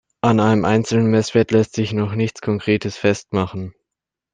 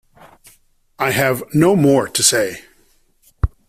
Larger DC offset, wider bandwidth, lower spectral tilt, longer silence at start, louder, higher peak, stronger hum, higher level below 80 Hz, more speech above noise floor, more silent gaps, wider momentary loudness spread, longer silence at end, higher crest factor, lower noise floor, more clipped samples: neither; second, 9.4 kHz vs 16 kHz; first, -6.5 dB/octave vs -4 dB/octave; second, 0.25 s vs 1 s; about the same, -18 LUFS vs -16 LUFS; about the same, -2 dBFS vs 0 dBFS; neither; second, -54 dBFS vs -34 dBFS; first, 67 dB vs 41 dB; neither; second, 7 LU vs 12 LU; first, 0.65 s vs 0.2 s; about the same, 16 dB vs 18 dB; first, -85 dBFS vs -56 dBFS; neither